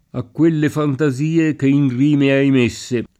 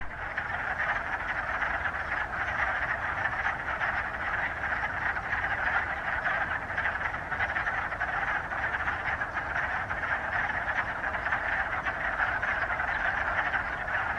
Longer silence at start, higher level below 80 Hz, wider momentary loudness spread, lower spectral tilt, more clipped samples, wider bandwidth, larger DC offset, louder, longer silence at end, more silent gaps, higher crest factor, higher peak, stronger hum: first, 0.15 s vs 0 s; second, -54 dBFS vs -48 dBFS; about the same, 5 LU vs 3 LU; first, -7 dB/octave vs -5 dB/octave; neither; second, 11 kHz vs 13 kHz; neither; first, -16 LUFS vs -29 LUFS; first, 0.15 s vs 0 s; neither; about the same, 12 dB vs 16 dB; first, -4 dBFS vs -14 dBFS; neither